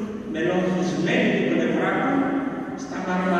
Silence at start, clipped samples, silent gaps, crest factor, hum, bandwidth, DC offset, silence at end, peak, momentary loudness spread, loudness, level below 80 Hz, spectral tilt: 0 s; under 0.1%; none; 14 dB; none; 9.2 kHz; under 0.1%; 0 s; -10 dBFS; 9 LU; -23 LUFS; -58 dBFS; -6.5 dB/octave